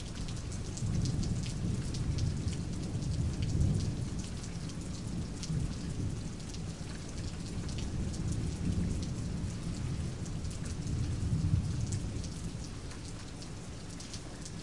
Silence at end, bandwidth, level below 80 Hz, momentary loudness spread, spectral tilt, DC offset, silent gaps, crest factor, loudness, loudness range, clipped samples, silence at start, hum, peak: 0 s; 11.5 kHz; -42 dBFS; 10 LU; -6 dB/octave; 0.3%; none; 18 dB; -37 LUFS; 4 LU; under 0.1%; 0 s; none; -18 dBFS